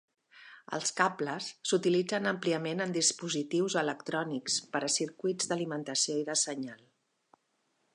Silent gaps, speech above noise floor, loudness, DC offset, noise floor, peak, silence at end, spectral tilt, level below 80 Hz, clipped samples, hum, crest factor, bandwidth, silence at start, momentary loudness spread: none; 45 dB; -31 LUFS; under 0.1%; -77 dBFS; -10 dBFS; 1.2 s; -3 dB/octave; -84 dBFS; under 0.1%; none; 22 dB; 11.5 kHz; 0.35 s; 7 LU